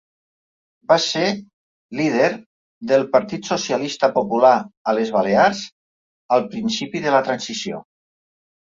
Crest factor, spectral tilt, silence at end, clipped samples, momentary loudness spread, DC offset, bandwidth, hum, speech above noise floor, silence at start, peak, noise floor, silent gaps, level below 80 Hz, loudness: 18 dB; -4 dB/octave; 0.8 s; under 0.1%; 15 LU; under 0.1%; 7.8 kHz; none; over 71 dB; 0.9 s; -2 dBFS; under -90 dBFS; 1.53-1.89 s, 2.46-2.81 s, 4.77-4.85 s, 5.72-6.29 s; -64 dBFS; -19 LUFS